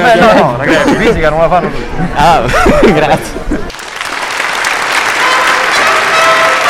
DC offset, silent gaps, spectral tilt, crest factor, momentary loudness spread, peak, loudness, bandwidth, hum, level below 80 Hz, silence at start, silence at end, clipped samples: under 0.1%; none; -4 dB/octave; 8 dB; 11 LU; 0 dBFS; -9 LUFS; 17 kHz; none; -24 dBFS; 0 s; 0 s; 0.3%